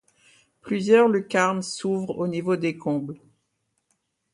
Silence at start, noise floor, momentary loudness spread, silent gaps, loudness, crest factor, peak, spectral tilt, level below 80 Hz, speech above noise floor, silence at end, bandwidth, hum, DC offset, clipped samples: 0.65 s; -75 dBFS; 12 LU; none; -23 LUFS; 18 dB; -6 dBFS; -5.5 dB/octave; -70 dBFS; 52 dB; 1.15 s; 11.5 kHz; none; under 0.1%; under 0.1%